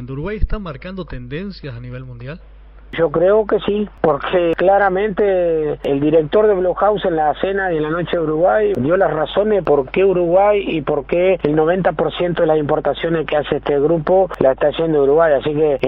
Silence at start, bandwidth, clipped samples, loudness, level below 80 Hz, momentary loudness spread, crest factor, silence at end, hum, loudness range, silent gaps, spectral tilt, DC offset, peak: 0 s; 5.4 kHz; under 0.1%; -16 LUFS; -36 dBFS; 14 LU; 16 dB; 0 s; none; 4 LU; none; -5 dB/octave; under 0.1%; 0 dBFS